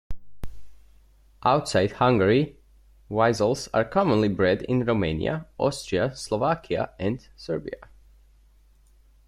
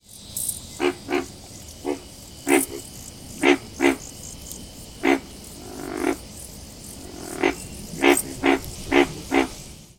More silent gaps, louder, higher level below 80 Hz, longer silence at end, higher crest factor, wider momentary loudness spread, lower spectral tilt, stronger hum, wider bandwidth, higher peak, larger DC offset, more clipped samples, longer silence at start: neither; about the same, -24 LUFS vs -24 LUFS; about the same, -48 dBFS vs -48 dBFS; first, 1.5 s vs 0.15 s; second, 18 dB vs 24 dB; second, 15 LU vs 18 LU; first, -6 dB/octave vs -3.5 dB/octave; neither; second, 13.5 kHz vs 18 kHz; second, -6 dBFS vs -2 dBFS; neither; neither; about the same, 0.1 s vs 0.1 s